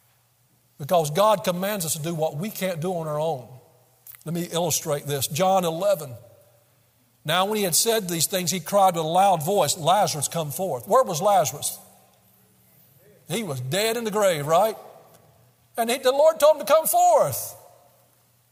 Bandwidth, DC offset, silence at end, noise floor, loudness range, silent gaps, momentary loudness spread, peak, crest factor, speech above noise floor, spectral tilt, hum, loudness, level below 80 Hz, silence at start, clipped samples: 16 kHz; under 0.1%; 0.95 s; -63 dBFS; 5 LU; none; 11 LU; -6 dBFS; 18 dB; 41 dB; -3.5 dB/octave; none; -22 LUFS; -68 dBFS; 0.8 s; under 0.1%